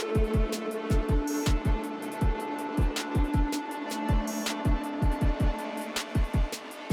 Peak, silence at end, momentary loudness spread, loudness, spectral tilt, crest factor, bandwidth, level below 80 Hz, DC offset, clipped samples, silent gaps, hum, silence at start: -14 dBFS; 0 s; 5 LU; -30 LUFS; -5.5 dB/octave; 12 dB; 16.5 kHz; -30 dBFS; under 0.1%; under 0.1%; none; none; 0 s